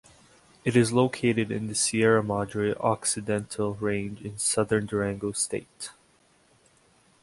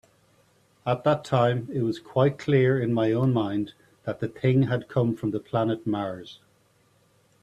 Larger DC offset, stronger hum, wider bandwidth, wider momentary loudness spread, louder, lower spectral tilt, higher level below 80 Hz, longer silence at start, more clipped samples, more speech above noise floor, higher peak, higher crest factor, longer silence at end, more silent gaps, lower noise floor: neither; neither; first, 11.5 kHz vs 8.8 kHz; about the same, 10 LU vs 12 LU; about the same, -26 LUFS vs -25 LUFS; second, -4.5 dB/octave vs -8.5 dB/octave; about the same, -58 dBFS vs -62 dBFS; second, 0.65 s vs 0.85 s; neither; about the same, 36 dB vs 39 dB; about the same, -8 dBFS vs -8 dBFS; about the same, 20 dB vs 18 dB; first, 1.3 s vs 1.1 s; neither; about the same, -63 dBFS vs -63 dBFS